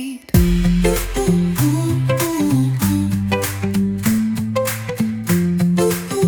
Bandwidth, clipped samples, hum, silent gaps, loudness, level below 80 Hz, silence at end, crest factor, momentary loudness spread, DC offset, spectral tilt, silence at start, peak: 19 kHz; under 0.1%; none; none; -18 LUFS; -28 dBFS; 0 s; 14 dB; 4 LU; under 0.1%; -6 dB/octave; 0 s; -2 dBFS